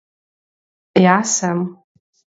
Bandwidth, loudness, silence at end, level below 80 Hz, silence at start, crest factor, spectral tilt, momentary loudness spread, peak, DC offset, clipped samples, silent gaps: 8 kHz; -16 LUFS; 0.65 s; -64 dBFS; 0.95 s; 20 dB; -4.5 dB/octave; 10 LU; 0 dBFS; under 0.1%; under 0.1%; none